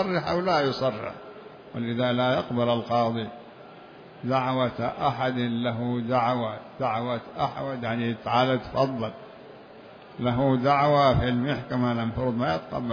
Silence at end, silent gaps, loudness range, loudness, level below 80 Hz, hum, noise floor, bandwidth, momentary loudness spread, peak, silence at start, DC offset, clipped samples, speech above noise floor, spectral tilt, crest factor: 0 s; none; 3 LU; -26 LUFS; -50 dBFS; none; -47 dBFS; 5.4 kHz; 22 LU; -8 dBFS; 0 s; under 0.1%; under 0.1%; 21 dB; -7.5 dB/octave; 18 dB